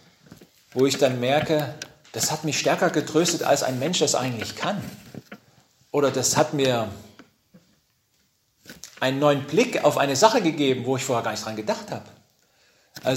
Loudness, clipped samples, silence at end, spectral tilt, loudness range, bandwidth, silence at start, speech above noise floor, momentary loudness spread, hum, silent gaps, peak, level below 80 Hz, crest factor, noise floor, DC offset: -23 LUFS; under 0.1%; 0 s; -4 dB/octave; 4 LU; 16 kHz; 0.3 s; 45 dB; 15 LU; none; none; 0 dBFS; -64 dBFS; 24 dB; -67 dBFS; under 0.1%